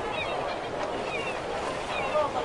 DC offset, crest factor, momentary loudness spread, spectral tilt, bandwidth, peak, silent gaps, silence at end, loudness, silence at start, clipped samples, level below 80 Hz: under 0.1%; 16 dB; 5 LU; -4 dB/octave; 11.5 kHz; -16 dBFS; none; 0 s; -30 LUFS; 0 s; under 0.1%; -52 dBFS